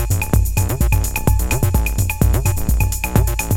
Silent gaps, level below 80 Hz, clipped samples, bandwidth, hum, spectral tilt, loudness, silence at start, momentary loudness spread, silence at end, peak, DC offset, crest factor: none; -20 dBFS; under 0.1%; 17 kHz; none; -5.5 dB/octave; -18 LUFS; 0 s; 2 LU; 0 s; -2 dBFS; under 0.1%; 14 dB